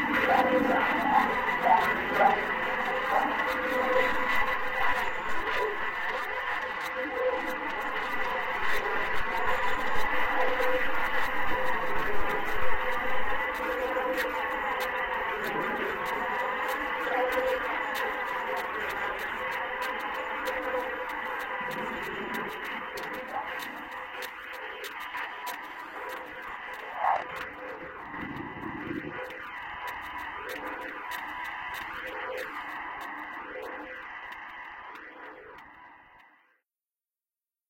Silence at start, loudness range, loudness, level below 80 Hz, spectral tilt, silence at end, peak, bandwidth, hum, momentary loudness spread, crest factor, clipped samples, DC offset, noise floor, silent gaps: 0 s; 11 LU; -30 LUFS; -52 dBFS; -4 dB/octave; 1.4 s; -10 dBFS; 16.5 kHz; none; 13 LU; 18 dB; under 0.1%; under 0.1%; under -90 dBFS; none